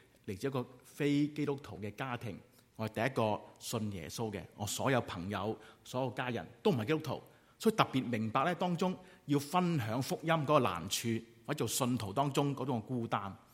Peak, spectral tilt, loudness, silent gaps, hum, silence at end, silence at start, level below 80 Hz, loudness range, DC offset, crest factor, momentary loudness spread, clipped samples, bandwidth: -10 dBFS; -5 dB/octave; -35 LUFS; none; none; 0.15 s; 0.25 s; -70 dBFS; 4 LU; under 0.1%; 26 dB; 10 LU; under 0.1%; 16.5 kHz